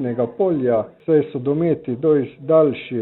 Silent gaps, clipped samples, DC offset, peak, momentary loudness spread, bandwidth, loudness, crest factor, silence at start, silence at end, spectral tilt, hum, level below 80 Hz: none; under 0.1%; under 0.1%; -4 dBFS; 5 LU; 4.1 kHz; -19 LUFS; 16 dB; 0 s; 0 s; -12 dB/octave; none; -58 dBFS